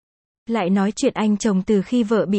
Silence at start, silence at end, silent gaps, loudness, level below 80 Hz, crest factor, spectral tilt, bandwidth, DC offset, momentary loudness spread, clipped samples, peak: 0.5 s; 0 s; none; -20 LUFS; -54 dBFS; 14 dB; -6 dB/octave; 8.8 kHz; under 0.1%; 3 LU; under 0.1%; -6 dBFS